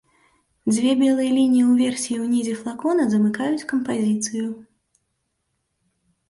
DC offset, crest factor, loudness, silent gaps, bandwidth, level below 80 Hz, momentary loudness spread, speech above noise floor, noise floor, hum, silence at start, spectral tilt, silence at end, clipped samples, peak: under 0.1%; 14 dB; -21 LUFS; none; 11.5 kHz; -66 dBFS; 10 LU; 54 dB; -74 dBFS; none; 0.65 s; -5 dB/octave; 1.7 s; under 0.1%; -8 dBFS